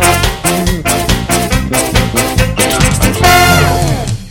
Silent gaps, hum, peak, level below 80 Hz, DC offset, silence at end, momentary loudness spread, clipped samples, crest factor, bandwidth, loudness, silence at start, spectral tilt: none; none; 0 dBFS; -20 dBFS; under 0.1%; 0 s; 6 LU; 0.3%; 10 dB; 18.5 kHz; -10 LUFS; 0 s; -4 dB/octave